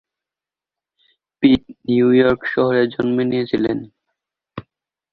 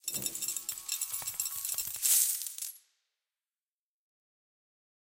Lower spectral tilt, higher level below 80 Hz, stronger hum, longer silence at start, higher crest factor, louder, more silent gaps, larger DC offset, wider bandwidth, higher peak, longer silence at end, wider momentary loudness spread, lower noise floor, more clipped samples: first, -9 dB/octave vs 1.5 dB/octave; first, -52 dBFS vs -76 dBFS; neither; first, 1.4 s vs 0.05 s; second, 18 dB vs 28 dB; first, -17 LUFS vs -31 LUFS; neither; neither; second, 4.9 kHz vs 17 kHz; first, -2 dBFS vs -10 dBFS; second, 0.5 s vs 2.25 s; first, 23 LU vs 12 LU; about the same, -89 dBFS vs under -90 dBFS; neither